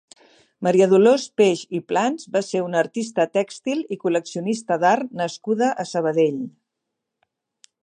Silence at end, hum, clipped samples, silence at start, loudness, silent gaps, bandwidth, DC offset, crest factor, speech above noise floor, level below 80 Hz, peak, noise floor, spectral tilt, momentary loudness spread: 1.35 s; none; under 0.1%; 0.6 s; -21 LUFS; none; 10 kHz; under 0.1%; 18 dB; 61 dB; -76 dBFS; -4 dBFS; -81 dBFS; -5.5 dB/octave; 10 LU